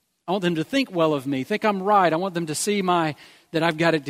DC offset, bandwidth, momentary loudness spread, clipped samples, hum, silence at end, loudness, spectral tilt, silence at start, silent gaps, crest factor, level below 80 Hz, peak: under 0.1%; 16 kHz; 8 LU; under 0.1%; none; 0 s; -23 LUFS; -5 dB/octave; 0.25 s; none; 20 dB; -68 dBFS; -4 dBFS